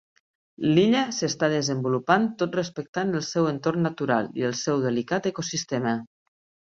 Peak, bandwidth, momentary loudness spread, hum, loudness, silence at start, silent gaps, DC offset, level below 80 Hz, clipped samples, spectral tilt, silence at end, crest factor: -4 dBFS; 7.8 kHz; 7 LU; none; -25 LUFS; 0.6 s; 2.89-2.93 s; under 0.1%; -66 dBFS; under 0.1%; -5 dB/octave; 0.7 s; 22 dB